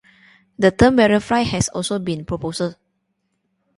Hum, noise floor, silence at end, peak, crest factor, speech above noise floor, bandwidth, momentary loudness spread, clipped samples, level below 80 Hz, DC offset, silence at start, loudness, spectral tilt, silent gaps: none; -71 dBFS; 1.05 s; 0 dBFS; 20 dB; 54 dB; 11.5 kHz; 12 LU; under 0.1%; -40 dBFS; under 0.1%; 0.6 s; -18 LUFS; -5 dB/octave; none